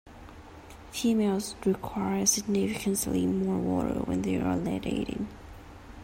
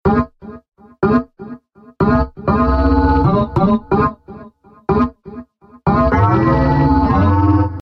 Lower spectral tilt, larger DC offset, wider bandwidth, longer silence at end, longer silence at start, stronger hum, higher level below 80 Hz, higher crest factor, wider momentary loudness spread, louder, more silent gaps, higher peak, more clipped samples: second, -4.5 dB/octave vs -10.5 dB/octave; neither; first, 16 kHz vs 6 kHz; about the same, 0 s vs 0 s; about the same, 0.05 s vs 0.05 s; neither; second, -50 dBFS vs -26 dBFS; about the same, 18 dB vs 14 dB; first, 23 LU vs 17 LU; second, -29 LUFS vs -15 LUFS; neither; second, -12 dBFS vs -2 dBFS; neither